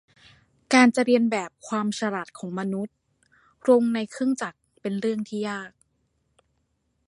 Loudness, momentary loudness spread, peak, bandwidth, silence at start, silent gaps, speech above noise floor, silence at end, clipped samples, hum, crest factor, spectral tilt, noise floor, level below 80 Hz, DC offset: -24 LUFS; 16 LU; -4 dBFS; 11.5 kHz; 0.7 s; none; 49 dB; 1.4 s; under 0.1%; none; 22 dB; -5 dB/octave; -72 dBFS; -72 dBFS; under 0.1%